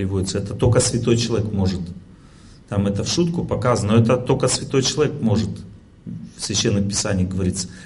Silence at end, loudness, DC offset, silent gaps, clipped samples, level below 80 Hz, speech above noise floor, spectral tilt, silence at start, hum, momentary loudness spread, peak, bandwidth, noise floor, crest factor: 0 s; -20 LUFS; under 0.1%; none; under 0.1%; -38 dBFS; 25 dB; -5 dB/octave; 0 s; none; 13 LU; -4 dBFS; 11.5 kHz; -45 dBFS; 16 dB